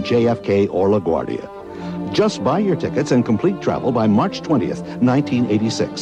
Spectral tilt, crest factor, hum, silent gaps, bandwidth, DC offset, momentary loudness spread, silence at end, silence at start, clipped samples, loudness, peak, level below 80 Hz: -6.5 dB/octave; 12 dB; none; none; 9.6 kHz; under 0.1%; 9 LU; 0 s; 0 s; under 0.1%; -18 LUFS; -6 dBFS; -50 dBFS